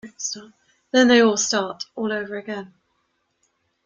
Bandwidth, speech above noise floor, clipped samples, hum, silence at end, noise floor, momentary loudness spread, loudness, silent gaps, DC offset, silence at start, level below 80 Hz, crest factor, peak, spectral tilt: 8.4 kHz; 50 dB; under 0.1%; none; 1.2 s; -71 dBFS; 17 LU; -20 LUFS; none; under 0.1%; 0.05 s; -66 dBFS; 20 dB; -4 dBFS; -2.5 dB/octave